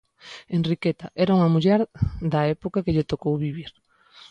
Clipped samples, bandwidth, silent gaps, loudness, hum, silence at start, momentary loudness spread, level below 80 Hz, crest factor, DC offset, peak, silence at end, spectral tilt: under 0.1%; 7.4 kHz; none; -23 LUFS; none; 0.25 s; 14 LU; -44 dBFS; 16 dB; under 0.1%; -8 dBFS; 0.6 s; -8.5 dB/octave